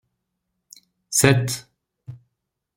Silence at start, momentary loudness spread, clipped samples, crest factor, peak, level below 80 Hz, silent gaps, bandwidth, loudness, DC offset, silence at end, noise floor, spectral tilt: 1.1 s; 26 LU; under 0.1%; 24 dB; -2 dBFS; -56 dBFS; none; 16.5 kHz; -20 LUFS; under 0.1%; 0.6 s; -78 dBFS; -4 dB/octave